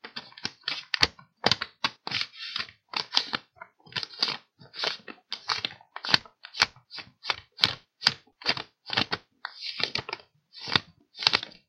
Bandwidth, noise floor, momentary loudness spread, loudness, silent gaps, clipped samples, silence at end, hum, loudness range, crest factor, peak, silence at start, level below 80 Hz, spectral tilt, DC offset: 16.5 kHz; -51 dBFS; 14 LU; -28 LUFS; none; under 0.1%; 0.2 s; none; 3 LU; 30 dB; -2 dBFS; 0.05 s; -62 dBFS; -2 dB/octave; under 0.1%